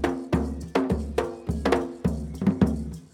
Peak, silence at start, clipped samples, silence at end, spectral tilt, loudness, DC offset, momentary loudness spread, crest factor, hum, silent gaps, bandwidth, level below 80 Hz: -6 dBFS; 0 s; under 0.1%; 0.05 s; -7.5 dB/octave; -27 LUFS; under 0.1%; 5 LU; 20 dB; none; none; 16 kHz; -36 dBFS